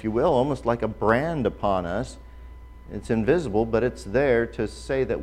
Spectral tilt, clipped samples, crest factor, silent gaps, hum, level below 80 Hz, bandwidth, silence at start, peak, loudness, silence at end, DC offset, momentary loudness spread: -7 dB/octave; under 0.1%; 18 dB; none; none; -42 dBFS; 12 kHz; 0 s; -6 dBFS; -24 LUFS; 0 s; under 0.1%; 9 LU